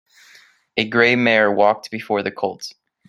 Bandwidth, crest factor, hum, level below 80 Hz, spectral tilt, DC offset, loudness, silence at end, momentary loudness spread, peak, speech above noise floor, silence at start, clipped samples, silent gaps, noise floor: 13 kHz; 18 dB; none; -64 dBFS; -5 dB/octave; under 0.1%; -18 LUFS; 0.4 s; 12 LU; -2 dBFS; 33 dB; 0.75 s; under 0.1%; none; -51 dBFS